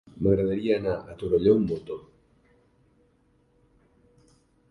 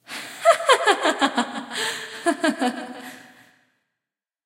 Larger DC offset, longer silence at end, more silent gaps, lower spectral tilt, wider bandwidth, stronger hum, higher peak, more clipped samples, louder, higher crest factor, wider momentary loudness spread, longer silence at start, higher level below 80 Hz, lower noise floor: neither; first, 2.7 s vs 1.25 s; neither; first, -9.5 dB/octave vs -1.5 dB/octave; second, 5.6 kHz vs 16 kHz; neither; second, -8 dBFS vs -2 dBFS; neither; second, -25 LUFS vs -21 LUFS; about the same, 20 dB vs 22 dB; second, 13 LU vs 17 LU; about the same, 0.15 s vs 0.1 s; first, -50 dBFS vs -84 dBFS; second, -65 dBFS vs -87 dBFS